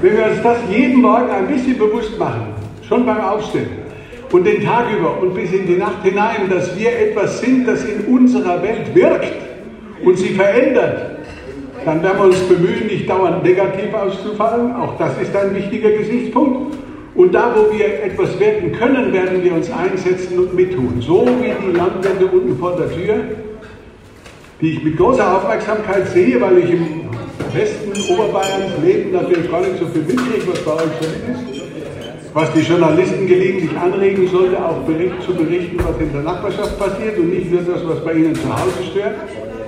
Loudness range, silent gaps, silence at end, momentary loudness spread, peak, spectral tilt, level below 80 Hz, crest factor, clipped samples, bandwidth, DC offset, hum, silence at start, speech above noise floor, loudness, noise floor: 3 LU; none; 0 s; 11 LU; 0 dBFS; -6.5 dB/octave; -42 dBFS; 14 dB; under 0.1%; 11 kHz; under 0.1%; none; 0 s; 24 dB; -15 LUFS; -39 dBFS